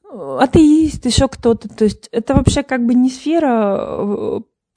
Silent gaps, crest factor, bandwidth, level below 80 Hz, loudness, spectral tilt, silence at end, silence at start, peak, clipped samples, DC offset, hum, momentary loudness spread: none; 14 dB; 10.5 kHz; -32 dBFS; -15 LUFS; -6 dB/octave; 0.35 s; 0.1 s; 0 dBFS; 0.1%; under 0.1%; none; 10 LU